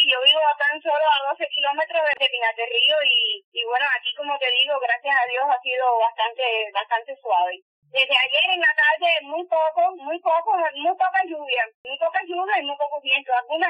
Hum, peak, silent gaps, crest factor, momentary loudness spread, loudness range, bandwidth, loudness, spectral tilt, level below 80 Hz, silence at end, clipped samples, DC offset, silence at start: none; -6 dBFS; 3.44-3.52 s, 7.62-7.82 s, 11.74-11.84 s; 16 dB; 8 LU; 3 LU; 9.2 kHz; -20 LUFS; -1 dB/octave; -86 dBFS; 0 s; under 0.1%; under 0.1%; 0 s